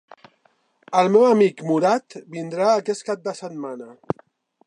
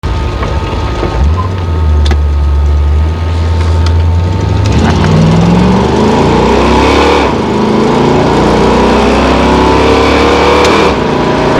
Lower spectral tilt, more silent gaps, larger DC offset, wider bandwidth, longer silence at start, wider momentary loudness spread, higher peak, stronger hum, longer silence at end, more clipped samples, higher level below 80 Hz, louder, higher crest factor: about the same, -6 dB/octave vs -6.5 dB/octave; neither; neither; about the same, 10.5 kHz vs 11 kHz; first, 0.9 s vs 0.05 s; first, 17 LU vs 6 LU; second, -4 dBFS vs 0 dBFS; neither; first, 0.75 s vs 0 s; second, under 0.1% vs 0.8%; second, -70 dBFS vs -16 dBFS; second, -21 LUFS vs -8 LUFS; first, 18 dB vs 8 dB